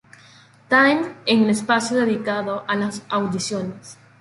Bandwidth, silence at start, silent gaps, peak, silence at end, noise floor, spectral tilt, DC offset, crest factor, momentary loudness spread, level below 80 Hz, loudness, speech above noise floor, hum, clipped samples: 11.5 kHz; 0.7 s; none; -2 dBFS; 0.25 s; -50 dBFS; -4.5 dB/octave; under 0.1%; 18 dB; 10 LU; -64 dBFS; -20 LUFS; 29 dB; none; under 0.1%